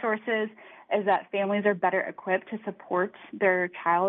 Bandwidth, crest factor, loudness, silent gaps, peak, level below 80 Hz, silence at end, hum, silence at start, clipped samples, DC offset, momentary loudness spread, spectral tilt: 4.1 kHz; 18 dB; -27 LUFS; none; -8 dBFS; -84 dBFS; 0 s; none; 0 s; under 0.1%; under 0.1%; 7 LU; -9 dB/octave